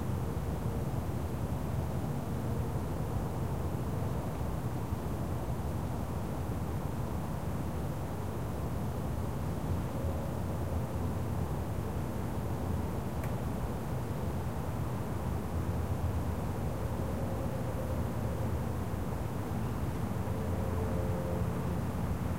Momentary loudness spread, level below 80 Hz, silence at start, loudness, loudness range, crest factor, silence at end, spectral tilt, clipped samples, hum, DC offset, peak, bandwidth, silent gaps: 2 LU; -42 dBFS; 0 s; -36 LUFS; 1 LU; 14 dB; 0 s; -7.5 dB/octave; under 0.1%; none; 0.7%; -20 dBFS; 16 kHz; none